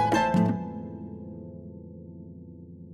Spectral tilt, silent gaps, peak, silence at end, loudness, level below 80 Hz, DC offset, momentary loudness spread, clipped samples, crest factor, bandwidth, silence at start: -6.5 dB/octave; none; -12 dBFS; 0 s; -28 LUFS; -58 dBFS; under 0.1%; 22 LU; under 0.1%; 18 dB; 12 kHz; 0 s